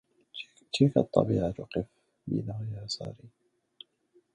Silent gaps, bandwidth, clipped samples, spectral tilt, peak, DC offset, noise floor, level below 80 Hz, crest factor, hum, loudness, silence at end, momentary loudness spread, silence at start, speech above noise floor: none; 10 kHz; under 0.1%; -7 dB/octave; -6 dBFS; under 0.1%; -68 dBFS; -56 dBFS; 24 dB; none; -30 LUFS; 1.05 s; 18 LU; 0.35 s; 39 dB